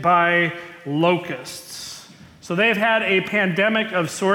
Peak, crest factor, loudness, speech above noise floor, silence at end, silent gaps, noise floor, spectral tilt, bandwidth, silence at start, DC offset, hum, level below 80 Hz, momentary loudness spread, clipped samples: -6 dBFS; 14 dB; -19 LUFS; 23 dB; 0 s; none; -44 dBFS; -4.5 dB/octave; 17.5 kHz; 0 s; under 0.1%; none; -64 dBFS; 16 LU; under 0.1%